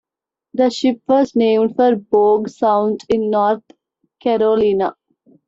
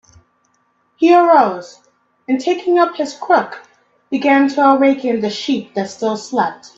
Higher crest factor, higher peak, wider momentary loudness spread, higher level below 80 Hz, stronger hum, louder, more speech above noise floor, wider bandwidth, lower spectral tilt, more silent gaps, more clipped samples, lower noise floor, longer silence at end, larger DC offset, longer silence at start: about the same, 14 dB vs 16 dB; second, -4 dBFS vs 0 dBFS; second, 6 LU vs 13 LU; first, -56 dBFS vs -64 dBFS; neither; about the same, -16 LUFS vs -15 LUFS; first, 69 dB vs 47 dB; about the same, 7.8 kHz vs 7.8 kHz; about the same, -6 dB/octave vs -5 dB/octave; neither; neither; first, -85 dBFS vs -61 dBFS; first, 0.55 s vs 0.1 s; neither; second, 0.55 s vs 1 s